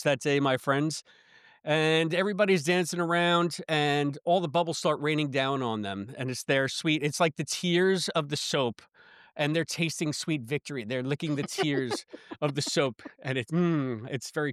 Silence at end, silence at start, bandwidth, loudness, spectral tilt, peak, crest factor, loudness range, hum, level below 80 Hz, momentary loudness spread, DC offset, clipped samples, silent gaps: 0 s; 0 s; 14.5 kHz; -28 LUFS; -4.5 dB/octave; -12 dBFS; 16 dB; 4 LU; none; -76 dBFS; 9 LU; under 0.1%; under 0.1%; none